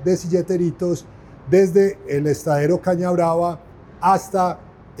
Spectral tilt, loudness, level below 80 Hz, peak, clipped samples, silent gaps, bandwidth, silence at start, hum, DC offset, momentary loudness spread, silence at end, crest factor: -7 dB/octave; -19 LUFS; -52 dBFS; -4 dBFS; under 0.1%; none; 16.5 kHz; 0 s; none; under 0.1%; 8 LU; 0 s; 14 dB